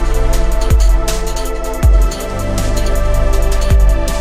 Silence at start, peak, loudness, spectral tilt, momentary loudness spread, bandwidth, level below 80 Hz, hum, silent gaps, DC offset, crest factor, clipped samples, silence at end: 0 s; 0 dBFS; -16 LUFS; -5 dB/octave; 7 LU; 15.5 kHz; -12 dBFS; none; none; under 0.1%; 10 dB; under 0.1%; 0 s